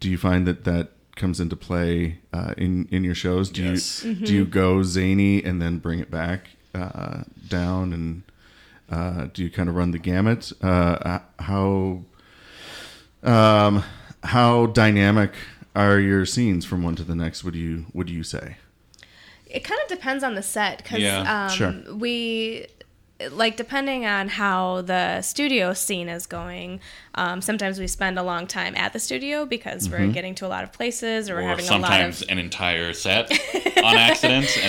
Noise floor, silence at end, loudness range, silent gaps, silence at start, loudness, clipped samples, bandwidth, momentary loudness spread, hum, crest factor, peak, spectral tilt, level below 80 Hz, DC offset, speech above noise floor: -53 dBFS; 0 s; 9 LU; none; 0 s; -22 LUFS; under 0.1%; 17 kHz; 15 LU; none; 18 dB; -4 dBFS; -4.5 dB/octave; -44 dBFS; under 0.1%; 30 dB